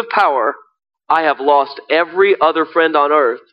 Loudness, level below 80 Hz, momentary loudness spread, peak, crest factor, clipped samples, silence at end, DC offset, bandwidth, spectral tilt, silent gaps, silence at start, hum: -14 LUFS; -62 dBFS; 5 LU; -2 dBFS; 14 dB; under 0.1%; 0.15 s; under 0.1%; 5.6 kHz; -5 dB/octave; none; 0 s; none